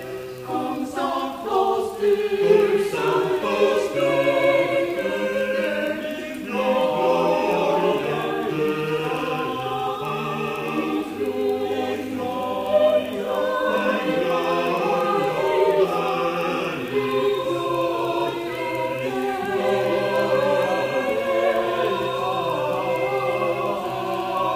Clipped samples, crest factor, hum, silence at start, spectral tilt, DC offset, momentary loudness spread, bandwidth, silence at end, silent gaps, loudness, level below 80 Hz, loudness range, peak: under 0.1%; 16 dB; none; 0 s; -5.5 dB/octave; under 0.1%; 7 LU; 15.5 kHz; 0 s; none; -22 LUFS; -58 dBFS; 4 LU; -6 dBFS